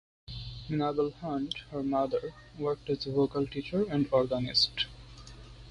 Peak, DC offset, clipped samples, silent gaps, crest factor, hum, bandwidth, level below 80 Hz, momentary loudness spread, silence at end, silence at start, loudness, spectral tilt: -14 dBFS; under 0.1%; under 0.1%; none; 18 dB; none; 11 kHz; -54 dBFS; 18 LU; 0 s; 0.3 s; -31 LUFS; -6 dB/octave